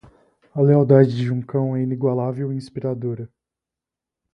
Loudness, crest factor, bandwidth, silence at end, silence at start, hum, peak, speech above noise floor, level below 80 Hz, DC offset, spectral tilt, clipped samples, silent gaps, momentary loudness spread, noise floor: -20 LUFS; 20 dB; 6 kHz; 1.05 s; 0.55 s; none; -2 dBFS; 68 dB; -62 dBFS; under 0.1%; -10 dB/octave; under 0.1%; none; 15 LU; -87 dBFS